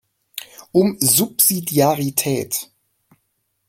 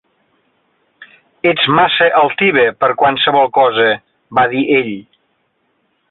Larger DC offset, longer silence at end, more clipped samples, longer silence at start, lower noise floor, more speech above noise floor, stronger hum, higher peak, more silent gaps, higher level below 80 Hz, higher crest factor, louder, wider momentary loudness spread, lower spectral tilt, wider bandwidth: neither; about the same, 1.05 s vs 1.1 s; neither; second, 0.35 s vs 1 s; first, -70 dBFS vs -63 dBFS; about the same, 53 dB vs 51 dB; neither; about the same, 0 dBFS vs -2 dBFS; neither; about the same, -60 dBFS vs -56 dBFS; first, 20 dB vs 14 dB; second, -17 LUFS vs -12 LUFS; first, 19 LU vs 7 LU; second, -4 dB/octave vs -8.5 dB/octave; first, 17 kHz vs 4.3 kHz